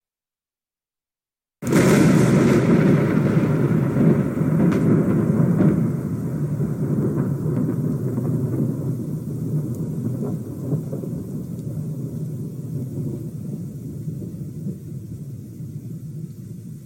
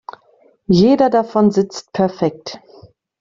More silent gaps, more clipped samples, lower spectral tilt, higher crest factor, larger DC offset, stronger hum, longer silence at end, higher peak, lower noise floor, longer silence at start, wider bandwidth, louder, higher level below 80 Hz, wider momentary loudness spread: neither; neither; about the same, -8 dB/octave vs -7 dB/octave; about the same, 16 dB vs 16 dB; neither; neither; second, 0 s vs 0.65 s; second, -6 dBFS vs 0 dBFS; first, under -90 dBFS vs -54 dBFS; first, 1.6 s vs 0.7 s; first, 17 kHz vs 7.6 kHz; second, -21 LUFS vs -15 LUFS; about the same, -48 dBFS vs -52 dBFS; second, 17 LU vs 23 LU